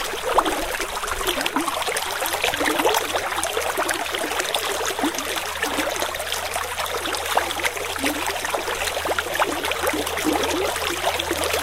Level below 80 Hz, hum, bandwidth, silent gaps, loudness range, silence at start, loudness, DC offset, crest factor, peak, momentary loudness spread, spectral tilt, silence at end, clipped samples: -44 dBFS; none; 16.5 kHz; none; 2 LU; 0 s; -23 LUFS; 0.4%; 22 dB; -2 dBFS; 4 LU; -1.5 dB/octave; 0 s; under 0.1%